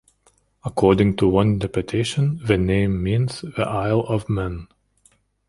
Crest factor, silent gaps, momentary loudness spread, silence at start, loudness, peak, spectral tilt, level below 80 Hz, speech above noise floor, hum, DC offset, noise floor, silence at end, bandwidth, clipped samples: 20 dB; none; 9 LU; 0.65 s; -21 LUFS; -2 dBFS; -7 dB/octave; -40 dBFS; 42 dB; none; under 0.1%; -61 dBFS; 0.85 s; 11.5 kHz; under 0.1%